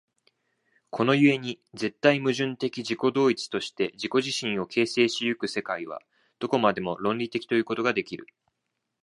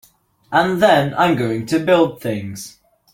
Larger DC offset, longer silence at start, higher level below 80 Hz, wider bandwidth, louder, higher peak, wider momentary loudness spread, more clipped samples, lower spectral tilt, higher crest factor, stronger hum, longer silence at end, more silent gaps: neither; first, 0.95 s vs 0.5 s; second, -70 dBFS vs -54 dBFS; second, 11.5 kHz vs 17 kHz; second, -26 LUFS vs -17 LUFS; about the same, -4 dBFS vs -2 dBFS; second, 11 LU vs 15 LU; neither; about the same, -5 dB/octave vs -5.5 dB/octave; first, 22 dB vs 16 dB; neither; first, 0.8 s vs 0.45 s; neither